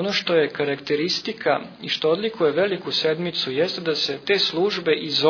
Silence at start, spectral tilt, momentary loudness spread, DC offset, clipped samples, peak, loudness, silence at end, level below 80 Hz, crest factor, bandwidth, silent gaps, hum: 0 s; -4.5 dB/octave; 4 LU; under 0.1%; under 0.1%; -4 dBFS; -22 LUFS; 0 s; -68 dBFS; 18 dB; 5.4 kHz; none; none